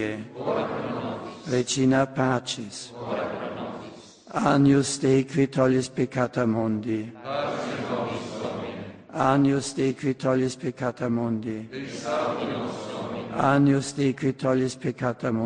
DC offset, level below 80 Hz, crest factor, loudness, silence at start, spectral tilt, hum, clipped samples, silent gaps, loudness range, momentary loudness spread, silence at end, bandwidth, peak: under 0.1%; -60 dBFS; 18 dB; -26 LUFS; 0 s; -6 dB/octave; none; under 0.1%; none; 4 LU; 12 LU; 0 s; 10 kHz; -6 dBFS